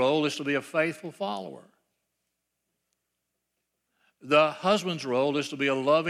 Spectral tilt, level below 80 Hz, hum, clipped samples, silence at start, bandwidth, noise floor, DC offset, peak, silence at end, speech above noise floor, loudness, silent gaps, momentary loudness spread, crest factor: -5 dB/octave; -82 dBFS; 60 Hz at -70 dBFS; under 0.1%; 0 s; 13.5 kHz; -82 dBFS; under 0.1%; -8 dBFS; 0 s; 55 dB; -27 LUFS; none; 11 LU; 20 dB